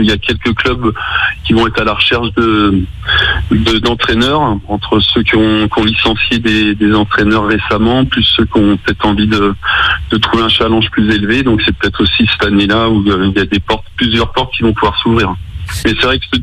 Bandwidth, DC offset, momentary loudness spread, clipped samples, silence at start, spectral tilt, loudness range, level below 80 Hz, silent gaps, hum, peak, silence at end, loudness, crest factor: 13.5 kHz; under 0.1%; 4 LU; under 0.1%; 0 s; -6 dB/octave; 1 LU; -26 dBFS; none; none; 0 dBFS; 0 s; -11 LUFS; 12 dB